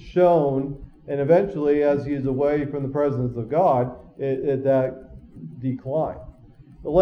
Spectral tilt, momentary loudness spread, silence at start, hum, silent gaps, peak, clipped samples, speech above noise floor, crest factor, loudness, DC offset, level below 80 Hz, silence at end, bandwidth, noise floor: -10 dB/octave; 13 LU; 0 s; none; none; -6 dBFS; under 0.1%; 26 dB; 16 dB; -22 LUFS; under 0.1%; -48 dBFS; 0 s; 6.4 kHz; -48 dBFS